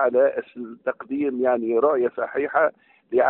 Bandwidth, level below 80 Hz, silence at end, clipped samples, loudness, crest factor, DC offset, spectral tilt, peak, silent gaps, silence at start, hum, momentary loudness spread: 4 kHz; -70 dBFS; 0 s; under 0.1%; -23 LUFS; 16 dB; under 0.1%; -5 dB/octave; -6 dBFS; none; 0 s; none; 10 LU